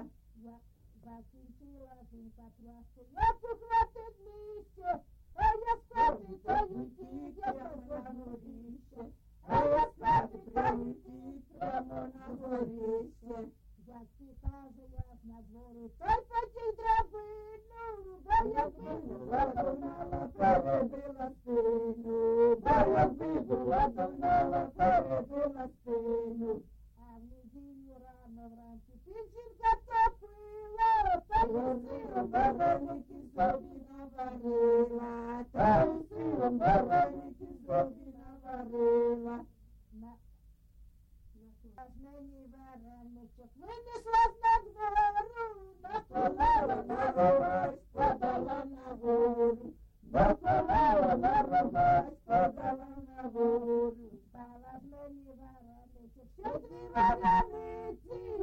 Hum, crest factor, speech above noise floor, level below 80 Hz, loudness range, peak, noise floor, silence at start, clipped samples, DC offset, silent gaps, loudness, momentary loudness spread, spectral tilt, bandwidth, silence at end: none; 18 dB; 27 dB; -48 dBFS; 11 LU; -14 dBFS; -60 dBFS; 0 s; under 0.1%; under 0.1%; none; -32 LUFS; 23 LU; -8 dB/octave; 7.4 kHz; 0 s